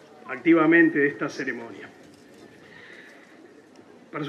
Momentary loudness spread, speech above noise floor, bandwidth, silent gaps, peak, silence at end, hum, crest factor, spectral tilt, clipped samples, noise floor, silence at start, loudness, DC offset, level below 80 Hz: 27 LU; 29 dB; 7 kHz; none; -6 dBFS; 0 s; none; 20 dB; -6.5 dB/octave; under 0.1%; -51 dBFS; 0.25 s; -21 LUFS; under 0.1%; -80 dBFS